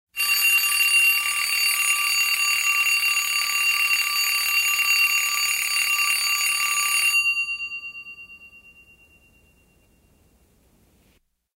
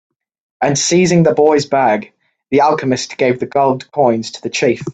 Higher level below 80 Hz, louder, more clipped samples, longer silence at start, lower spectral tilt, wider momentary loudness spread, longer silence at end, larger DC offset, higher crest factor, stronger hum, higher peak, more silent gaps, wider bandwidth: second, -66 dBFS vs -54 dBFS; second, -19 LUFS vs -14 LUFS; neither; second, 0.15 s vs 0.6 s; second, 4.5 dB/octave vs -5 dB/octave; about the same, 5 LU vs 7 LU; first, 3 s vs 0 s; neither; about the same, 16 dB vs 14 dB; neither; second, -8 dBFS vs 0 dBFS; neither; first, 16 kHz vs 9.2 kHz